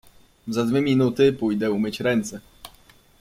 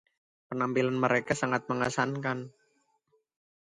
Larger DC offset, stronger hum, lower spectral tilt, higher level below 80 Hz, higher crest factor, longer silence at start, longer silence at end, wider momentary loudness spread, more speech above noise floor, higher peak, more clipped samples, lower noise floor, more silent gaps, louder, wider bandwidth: neither; neither; about the same, -6 dB/octave vs -5.5 dB/octave; first, -56 dBFS vs -68 dBFS; about the same, 18 dB vs 20 dB; about the same, 0.45 s vs 0.5 s; second, 0.5 s vs 1.15 s; first, 14 LU vs 10 LU; second, 32 dB vs 44 dB; first, -6 dBFS vs -12 dBFS; neither; second, -54 dBFS vs -73 dBFS; neither; first, -22 LUFS vs -30 LUFS; first, 16 kHz vs 11 kHz